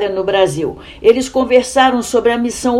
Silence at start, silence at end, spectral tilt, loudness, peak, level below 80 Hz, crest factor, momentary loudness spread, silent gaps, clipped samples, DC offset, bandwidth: 0 s; 0 s; -4 dB/octave; -14 LUFS; 0 dBFS; -42 dBFS; 14 dB; 4 LU; none; 0.2%; under 0.1%; 14 kHz